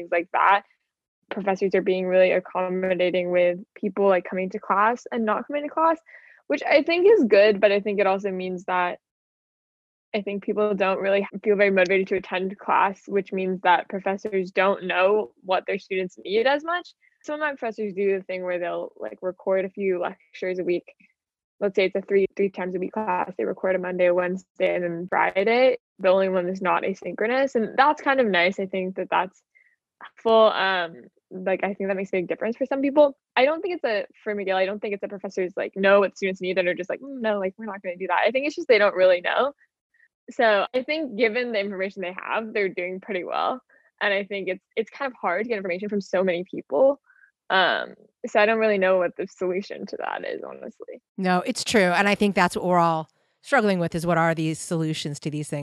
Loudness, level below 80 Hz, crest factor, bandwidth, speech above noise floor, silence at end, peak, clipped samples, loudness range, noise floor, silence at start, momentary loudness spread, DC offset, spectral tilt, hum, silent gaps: -23 LUFS; -68 dBFS; 20 dB; 12.5 kHz; 40 dB; 0 s; -4 dBFS; under 0.1%; 5 LU; -63 dBFS; 0 s; 11 LU; under 0.1%; -5.5 dB/octave; none; 1.08-1.22 s, 9.11-10.12 s, 21.44-21.59 s, 24.50-24.55 s, 25.80-25.96 s, 39.81-39.90 s, 40.14-40.27 s, 51.08-51.15 s